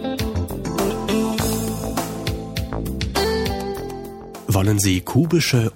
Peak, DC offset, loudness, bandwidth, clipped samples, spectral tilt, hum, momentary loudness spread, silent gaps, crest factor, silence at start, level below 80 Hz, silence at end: -6 dBFS; under 0.1%; -22 LUFS; 17 kHz; under 0.1%; -5 dB/octave; none; 10 LU; none; 16 dB; 0 s; -34 dBFS; 0 s